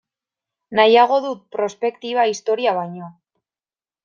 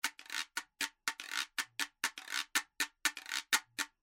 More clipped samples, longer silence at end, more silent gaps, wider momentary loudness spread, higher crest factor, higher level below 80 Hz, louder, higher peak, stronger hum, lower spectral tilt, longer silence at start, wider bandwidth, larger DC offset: neither; first, 0.95 s vs 0.15 s; neither; first, 13 LU vs 7 LU; second, 18 dB vs 30 dB; first, -72 dBFS vs -82 dBFS; first, -18 LUFS vs -37 LUFS; first, -2 dBFS vs -10 dBFS; neither; first, -4 dB/octave vs 2.5 dB/octave; first, 0.7 s vs 0.05 s; second, 7.4 kHz vs 16.5 kHz; neither